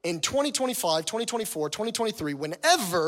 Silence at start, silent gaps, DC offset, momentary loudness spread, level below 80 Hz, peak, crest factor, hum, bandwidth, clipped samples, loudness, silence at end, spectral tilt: 0.05 s; none; under 0.1%; 7 LU; -64 dBFS; -10 dBFS; 18 dB; none; 17 kHz; under 0.1%; -27 LUFS; 0 s; -2.5 dB/octave